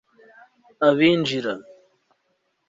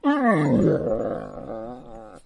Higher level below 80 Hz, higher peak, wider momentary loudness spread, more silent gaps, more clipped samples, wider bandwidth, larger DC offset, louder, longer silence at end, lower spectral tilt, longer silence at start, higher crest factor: second, -66 dBFS vs -48 dBFS; about the same, -4 dBFS vs -6 dBFS; second, 13 LU vs 19 LU; neither; neither; second, 7.8 kHz vs 11 kHz; neither; about the same, -20 LUFS vs -22 LUFS; first, 1.05 s vs 0.1 s; second, -6 dB/octave vs -8.5 dB/octave; first, 0.8 s vs 0.05 s; about the same, 20 dB vs 16 dB